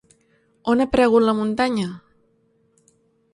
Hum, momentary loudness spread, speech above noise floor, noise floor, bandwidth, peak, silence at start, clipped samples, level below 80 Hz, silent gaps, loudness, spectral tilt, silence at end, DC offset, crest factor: none; 14 LU; 44 dB; -63 dBFS; 11.5 kHz; -2 dBFS; 0.65 s; under 0.1%; -50 dBFS; none; -20 LUFS; -6 dB/octave; 1.35 s; under 0.1%; 20 dB